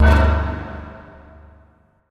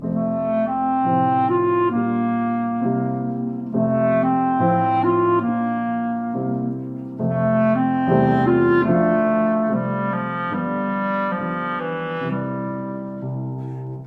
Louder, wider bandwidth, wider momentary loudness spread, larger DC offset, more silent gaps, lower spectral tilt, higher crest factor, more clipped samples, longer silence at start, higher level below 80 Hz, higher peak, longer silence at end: about the same, -19 LUFS vs -21 LUFS; first, 6 kHz vs 4.4 kHz; first, 26 LU vs 10 LU; neither; neither; second, -7.5 dB/octave vs -10.5 dB/octave; about the same, 16 dB vs 14 dB; neither; about the same, 0 s vs 0 s; first, -22 dBFS vs -54 dBFS; about the same, -4 dBFS vs -6 dBFS; first, 1.1 s vs 0 s